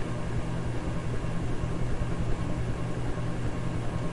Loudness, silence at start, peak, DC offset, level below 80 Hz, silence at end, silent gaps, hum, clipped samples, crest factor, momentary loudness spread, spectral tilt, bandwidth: -33 LUFS; 0 s; -16 dBFS; 2%; -36 dBFS; 0 s; none; none; under 0.1%; 14 dB; 1 LU; -7 dB/octave; 11.5 kHz